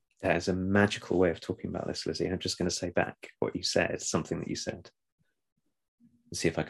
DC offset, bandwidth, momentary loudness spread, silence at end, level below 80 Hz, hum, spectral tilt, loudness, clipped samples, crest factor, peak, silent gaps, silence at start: under 0.1%; 12.5 kHz; 9 LU; 0 s; -64 dBFS; none; -4.5 dB/octave; -31 LUFS; under 0.1%; 22 dB; -10 dBFS; 5.12-5.18 s, 5.52-5.56 s, 5.88-5.98 s; 0.2 s